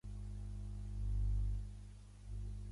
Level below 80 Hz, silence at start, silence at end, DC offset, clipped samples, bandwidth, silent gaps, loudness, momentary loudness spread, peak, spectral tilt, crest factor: -42 dBFS; 0.05 s; 0 s; under 0.1%; under 0.1%; 11 kHz; none; -44 LUFS; 14 LU; -30 dBFS; -7.5 dB/octave; 12 dB